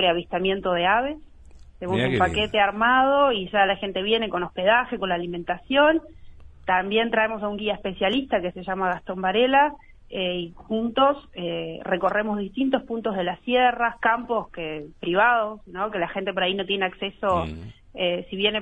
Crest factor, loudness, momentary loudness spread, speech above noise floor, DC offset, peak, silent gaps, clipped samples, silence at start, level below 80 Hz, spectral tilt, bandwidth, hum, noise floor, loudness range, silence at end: 18 dB; -23 LUFS; 11 LU; 23 dB; under 0.1%; -6 dBFS; none; under 0.1%; 0 s; -48 dBFS; -6 dB/octave; 8.8 kHz; none; -46 dBFS; 4 LU; 0 s